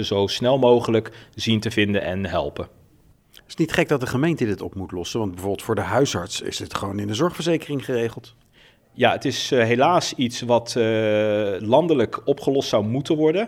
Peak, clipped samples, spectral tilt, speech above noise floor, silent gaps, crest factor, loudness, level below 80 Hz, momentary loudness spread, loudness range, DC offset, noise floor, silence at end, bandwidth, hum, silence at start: -2 dBFS; under 0.1%; -5 dB/octave; 34 dB; none; 20 dB; -22 LUFS; -52 dBFS; 10 LU; 5 LU; under 0.1%; -56 dBFS; 0 s; 17 kHz; none; 0 s